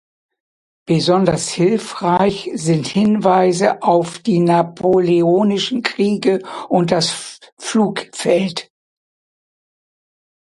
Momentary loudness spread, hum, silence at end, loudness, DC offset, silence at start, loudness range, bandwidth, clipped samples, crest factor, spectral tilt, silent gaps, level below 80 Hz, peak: 7 LU; none; 1.8 s; -16 LUFS; under 0.1%; 0.9 s; 5 LU; 11.5 kHz; under 0.1%; 16 dB; -5.5 dB/octave; 7.52-7.57 s; -56 dBFS; 0 dBFS